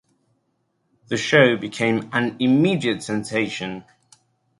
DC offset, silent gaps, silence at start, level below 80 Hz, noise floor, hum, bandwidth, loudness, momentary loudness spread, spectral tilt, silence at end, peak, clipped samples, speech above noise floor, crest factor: under 0.1%; none; 1.1 s; -62 dBFS; -70 dBFS; none; 11.5 kHz; -20 LUFS; 13 LU; -5.5 dB/octave; 0.8 s; -2 dBFS; under 0.1%; 50 dB; 20 dB